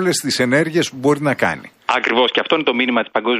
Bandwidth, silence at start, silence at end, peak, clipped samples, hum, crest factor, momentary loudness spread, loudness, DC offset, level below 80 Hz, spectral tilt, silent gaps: 15.5 kHz; 0 s; 0 s; -2 dBFS; under 0.1%; none; 16 dB; 4 LU; -17 LUFS; under 0.1%; -60 dBFS; -4 dB/octave; none